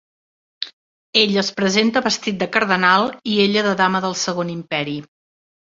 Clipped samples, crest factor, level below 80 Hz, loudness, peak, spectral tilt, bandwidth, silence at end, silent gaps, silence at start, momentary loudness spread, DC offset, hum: under 0.1%; 20 dB; -62 dBFS; -18 LUFS; 0 dBFS; -3.5 dB/octave; 7.8 kHz; 0.7 s; 0.73-1.13 s; 0.6 s; 13 LU; under 0.1%; none